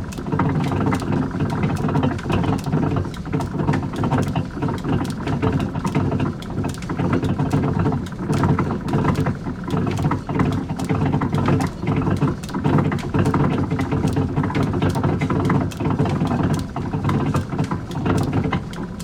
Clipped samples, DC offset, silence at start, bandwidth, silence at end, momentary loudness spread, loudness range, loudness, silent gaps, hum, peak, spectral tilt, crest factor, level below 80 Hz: under 0.1%; under 0.1%; 0 s; 14.5 kHz; 0 s; 5 LU; 2 LU; -21 LUFS; none; none; -4 dBFS; -7.5 dB/octave; 16 dB; -38 dBFS